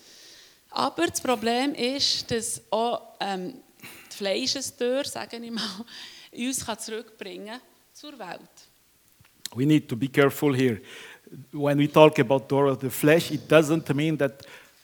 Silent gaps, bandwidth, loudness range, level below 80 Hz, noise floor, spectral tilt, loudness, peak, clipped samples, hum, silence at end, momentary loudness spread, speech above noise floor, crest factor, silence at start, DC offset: none; over 20 kHz; 12 LU; -66 dBFS; -61 dBFS; -4.5 dB/octave; -24 LUFS; -2 dBFS; under 0.1%; none; 0.25 s; 20 LU; 36 dB; 24 dB; 0.7 s; under 0.1%